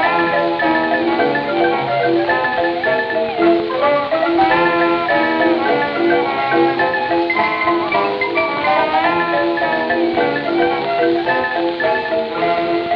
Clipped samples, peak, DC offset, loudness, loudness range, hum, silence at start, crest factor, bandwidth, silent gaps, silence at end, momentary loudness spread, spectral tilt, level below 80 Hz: under 0.1%; -2 dBFS; under 0.1%; -16 LUFS; 1 LU; none; 0 s; 14 dB; 5.6 kHz; none; 0 s; 3 LU; -7 dB/octave; -54 dBFS